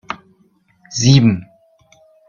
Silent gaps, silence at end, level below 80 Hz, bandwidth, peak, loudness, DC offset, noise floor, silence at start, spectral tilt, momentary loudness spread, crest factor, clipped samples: none; 0.85 s; -48 dBFS; 7.4 kHz; 0 dBFS; -14 LUFS; under 0.1%; -57 dBFS; 0.1 s; -5.5 dB/octave; 20 LU; 18 dB; under 0.1%